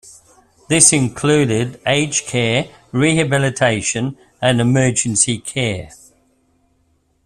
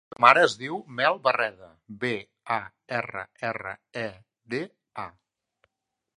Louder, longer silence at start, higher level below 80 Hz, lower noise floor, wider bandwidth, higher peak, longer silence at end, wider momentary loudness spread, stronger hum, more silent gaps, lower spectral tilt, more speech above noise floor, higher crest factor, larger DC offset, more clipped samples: first, -16 LUFS vs -26 LUFS; second, 0.05 s vs 0.2 s; first, -48 dBFS vs -70 dBFS; second, -61 dBFS vs -82 dBFS; first, 14 kHz vs 11.5 kHz; about the same, 0 dBFS vs 0 dBFS; first, 1.4 s vs 1.1 s; second, 10 LU vs 18 LU; neither; neither; about the same, -3.5 dB/octave vs -4 dB/octave; second, 45 dB vs 55 dB; second, 18 dB vs 26 dB; neither; neither